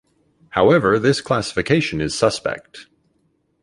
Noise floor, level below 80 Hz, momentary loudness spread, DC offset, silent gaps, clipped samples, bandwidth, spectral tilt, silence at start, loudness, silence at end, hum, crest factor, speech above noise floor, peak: -65 dBFS; -48 dBFS; 11 LU; under 0.1%; none; under 0.1%; 11.5 kHz; -5 dB/octave; 0.55 s; -18 LUFS; 0.8 s; none; 18 dB; 47 dB; -2 dBFS